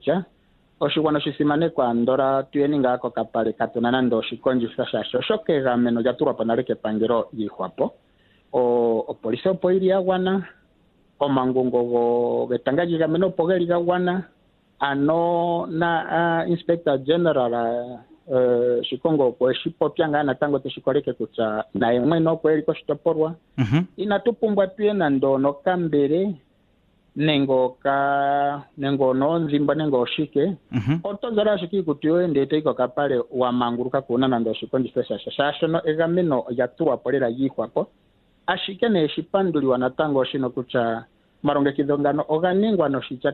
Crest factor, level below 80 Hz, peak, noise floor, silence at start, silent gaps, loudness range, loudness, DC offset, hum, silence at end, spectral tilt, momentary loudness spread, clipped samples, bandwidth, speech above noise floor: 16 dB; -60 dBFS; -6 dBFS; -61 dBFS; 0.05 s; none; 2 LU; -22 LUFS; under 0.1%; none; 0 s; -9 dB/octave; 6 LU; under 0.1%; 4.4 kHz; 40 dB